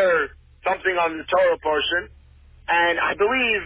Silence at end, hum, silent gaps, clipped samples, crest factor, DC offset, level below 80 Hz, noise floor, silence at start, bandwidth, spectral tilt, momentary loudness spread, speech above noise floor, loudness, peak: 0 s; none; none; under 0.1%; 12 dB; under 0.1%; -50 dBFS; -49 dBFS; 0 s; 4 kHz; -7 dB/octave; 8 LU; 28 dB; -21 LUFS; -8 dBFS